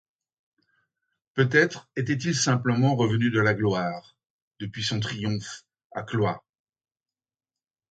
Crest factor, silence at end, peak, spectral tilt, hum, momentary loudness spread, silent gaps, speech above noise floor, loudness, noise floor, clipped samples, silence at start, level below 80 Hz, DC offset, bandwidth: 22 dB; 1.5 s; -6 dBFS; -5 dB/octave; none; 17 LU; 4.30-4.51 s, 5.85-5.90 s; over 65 dB; -25 LUFS; under -90 dBFS; under 0.1%; 1.35 s; -60 dBFS; under 0.1%; 9.2 kHz